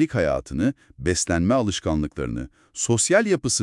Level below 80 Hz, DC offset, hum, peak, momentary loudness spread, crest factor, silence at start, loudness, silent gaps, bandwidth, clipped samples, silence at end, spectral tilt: -42 dBFS; under 0.1%; none; -6 dBFS; 11 LU; 16 dB; 0 s; -23 LUFS; none; 12 kHz; under 0.1%; 0 s; -4.5 dB/octave